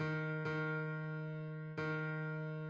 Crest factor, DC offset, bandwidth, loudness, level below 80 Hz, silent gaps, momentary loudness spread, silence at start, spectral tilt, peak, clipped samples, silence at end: 12 dB; under 0.1%; 6.8 kHz; -41 LUFS; -76 dBFS; none; 5 LU; 0 s; -8.5 dB/octave; -28 dBFS; under 0.1%; 0 s